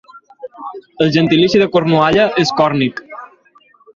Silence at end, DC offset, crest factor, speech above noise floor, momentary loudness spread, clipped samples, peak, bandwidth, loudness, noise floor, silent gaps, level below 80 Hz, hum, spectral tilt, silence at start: 0.7 s; under 0.1%; 14 dB; 38 dB; 22 LU; under 0.1%; -2 dBFS; 7.4 kHz; -13 LUFS; -50 dBFS; none; -50 dBFS; none; -6 dB/octave; 0.15 s